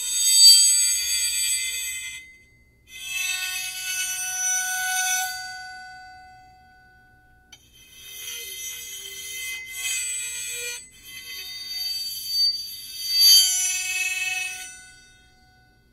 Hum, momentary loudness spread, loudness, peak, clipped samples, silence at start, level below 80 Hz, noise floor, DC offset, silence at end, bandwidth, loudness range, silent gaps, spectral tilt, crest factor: 60 Hz at -65 dBFS; 23 LU; -20 LUFS; 0 dBFS; under 0.1%; 0 s; -62 dBFS; -57 dBFS; under 0.1%; 1 s; 16 kHz; 16 LU; none; 4.5 dB/octave; 24 dB